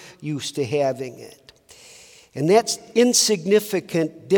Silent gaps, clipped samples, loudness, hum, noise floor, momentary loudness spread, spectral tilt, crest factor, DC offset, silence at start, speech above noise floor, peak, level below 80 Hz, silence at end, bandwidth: none; under 0.1%; -20 LUFS; none; -48 dBFS; 15 LU; -3.5 dB/octave; 18 dB; under 0.1%; 0 s; 27 dB; -4 dBFS; -70 dBFS; 0 s; 18 kHz